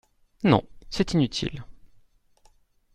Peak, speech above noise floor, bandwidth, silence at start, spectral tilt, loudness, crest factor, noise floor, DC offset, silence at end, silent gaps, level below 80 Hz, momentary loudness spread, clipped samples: -4 dBFS; 37 dB; 11.5 kHz; 0.4 s; -6 dB/octave; -25 LUFS; 24 dB; -60 dBFS; under 0.1%; 1.25 s; none; -48 dBFS; 13 LU; under 0.1%